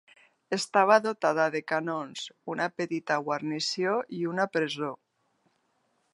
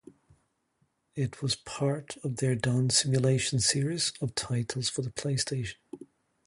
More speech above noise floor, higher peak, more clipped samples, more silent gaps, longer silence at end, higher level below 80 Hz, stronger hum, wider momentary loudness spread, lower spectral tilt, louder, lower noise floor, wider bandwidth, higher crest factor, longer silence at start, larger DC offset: about the same, 45 dB vs 45 dB; first, -6 dBFS vs -10 dBFS; neither; neither; first, 1.2 s vs 0.4 s; second, -82 dBFS vs -60 dBFS; neither; about the same, 12 LU vs 12 LU; about the same, -4 dB/octave vs -4 dB/octave; about the same, -28 LUFS vs -29 LUFS; about the same, -73 dBFS vs -74 dBFS; about the same, 11.5 kHz vs 11.5 kHz; about the same, 24 dB vs 20 dB; second, 0.5 s vs 1.15 s; neither